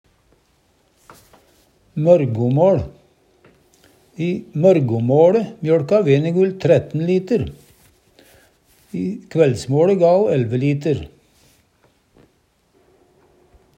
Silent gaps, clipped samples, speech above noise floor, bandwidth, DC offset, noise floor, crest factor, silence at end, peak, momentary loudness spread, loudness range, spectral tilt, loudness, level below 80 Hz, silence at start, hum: none; under 0.1%; 45 dB; 9.8 kHz; under 0.1%; -61 dBFS; 18 dB; 2.7 s; 0 dBFS; 12 LU; 5 LU; -8.5 dB/octave; -17 LUFS; -52 dBFS; 1.95 s; none